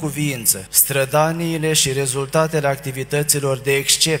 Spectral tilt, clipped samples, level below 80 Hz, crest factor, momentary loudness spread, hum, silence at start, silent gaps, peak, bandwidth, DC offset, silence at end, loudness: -3 dB/octave; under 0.1%; -50 dBFS; 18 dB; 7 LU; none; 0 s; none; 0 dBFS; 16.5 kHz; under 0.1%; 0 s; -17 LUFS